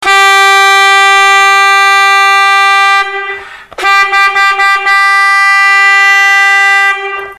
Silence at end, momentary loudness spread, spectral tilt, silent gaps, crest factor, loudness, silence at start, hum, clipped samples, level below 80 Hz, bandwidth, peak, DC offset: 0.05 s; 6 LU; 2 dB/octave; none; 6 dB; -5 LUFS; 0 s; none; under 0.1%; -52 dBFS; 14 kHz; 0 dBFS; under 0.1%